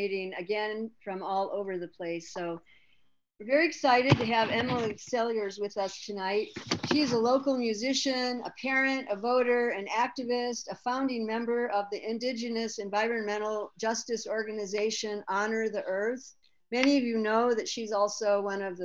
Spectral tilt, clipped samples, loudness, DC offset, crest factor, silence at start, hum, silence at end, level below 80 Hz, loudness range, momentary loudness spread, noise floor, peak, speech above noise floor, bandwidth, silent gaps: -4.5 dB/octave; under 0.1%; -30 LUFS; under 0.1%; 22 dB; 0 s; none; 0 s; -70 dBFS; 4 LU; 9 LU; -67 dBFS; -8 dBFS; 38 dB; 9.8 kHz; none